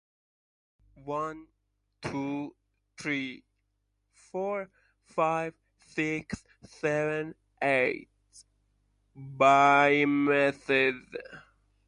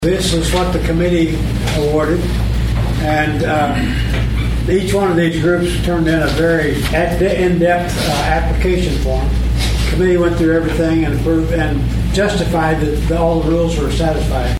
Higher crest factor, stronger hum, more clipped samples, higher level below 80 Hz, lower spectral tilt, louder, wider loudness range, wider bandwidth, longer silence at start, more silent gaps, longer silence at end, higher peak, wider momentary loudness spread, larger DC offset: first, 22 dB vs 12 dB; first, 50 Hz at -70 dBFS vs none; neither; second, -66 dBFS vs -20 dBFS; about the same, -5.5 dB/octave vs -6 dB/octave; second, -28 LUFS vs -15 LUFS; first, 12 LU vs 1 LU; second, 10.5 kHz vs 15.5 kHz; first, 1.05 s vs 0 s; neither; first, 0.45 s vs 0 s; second, -8 dBFS vs -2 dBFS; first, 21 LU vs 3 LU; neither